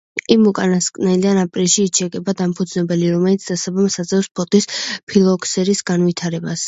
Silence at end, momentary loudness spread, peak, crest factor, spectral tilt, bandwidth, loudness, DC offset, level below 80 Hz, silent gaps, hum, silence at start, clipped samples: 0 s; 7 LU; 0 dBFS; 16 dB; -4.5 dB/octave; 8 kHz; -17 LUFS; under 0.1%; -58 dBFS; 4.31-4.35 s, 5.03-5.07 s; none; 0.15 s; under 0.1%